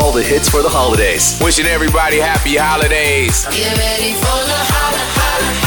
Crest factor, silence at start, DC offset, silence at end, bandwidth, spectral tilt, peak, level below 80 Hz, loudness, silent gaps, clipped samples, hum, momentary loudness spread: 12 dB; 0 s; under 0.1%; 0 s; over 20 kHz; -3 dB/octave; -2 dBFS; -22 dBFS; -12 LUFS; none; under 0.1%; none; 3 LU